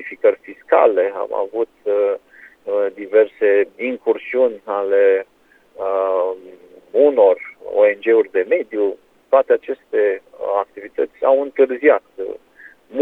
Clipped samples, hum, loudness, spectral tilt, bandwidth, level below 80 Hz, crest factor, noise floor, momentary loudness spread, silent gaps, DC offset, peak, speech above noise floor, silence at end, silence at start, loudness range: under 0.1%; none; -18 LUFS; -6.5 dB/octave; 3.9 kHz; -68 dBFS; 18 dB; -43 dBFS; 12 LU; none; under 0.1%; 0 dBFS; 26 dB; 0 s; 0 s; 2 LU